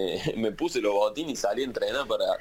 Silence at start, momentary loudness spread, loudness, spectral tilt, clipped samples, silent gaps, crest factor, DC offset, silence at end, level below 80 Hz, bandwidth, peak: 0 s; 4 LU; -28 LUFS; -4 dB/octave; under 0.1%; none; 16 dB; under 0.1%; 0 s; -54 dBFS; 16.5 kHz; -12 dBFS